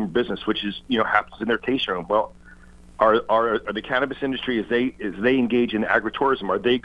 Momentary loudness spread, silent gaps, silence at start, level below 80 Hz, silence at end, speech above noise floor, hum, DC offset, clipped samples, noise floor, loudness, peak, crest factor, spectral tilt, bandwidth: 6 LU; none; 0 s; -50 dBFS; 0.05 s; 24 dB; none; under 0.1%; under 0.1%; -46 dBFS; -22 LUFS; -2 dBFS; 22 dB; -6.5 dB/octave; 8.8 kHz